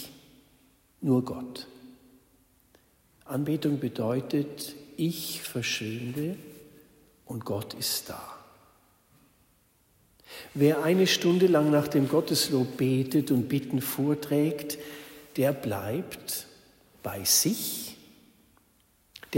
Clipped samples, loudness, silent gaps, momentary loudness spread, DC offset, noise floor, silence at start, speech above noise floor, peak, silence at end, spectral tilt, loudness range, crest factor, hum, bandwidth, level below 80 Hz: under 0.1%; -28 LUFS; none; 19 LU; under 0.1%; -66 dBFS; 0 s; 38 dB; -10 dBFS; 0 s; -4.5 dB/octave; 11 LU; 20 dB; none; 16.5 kHz; -68 dBFS